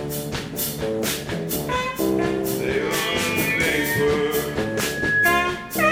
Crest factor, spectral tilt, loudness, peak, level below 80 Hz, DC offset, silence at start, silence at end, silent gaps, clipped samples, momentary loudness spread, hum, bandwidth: 18 dB; -3.5 dB/octave; -22 LUFS; -4 dBFS; -44 dBFS; under 0.1%; 0 s; 0 s; none; under 0.1%; 7 LU; none; 18 kHz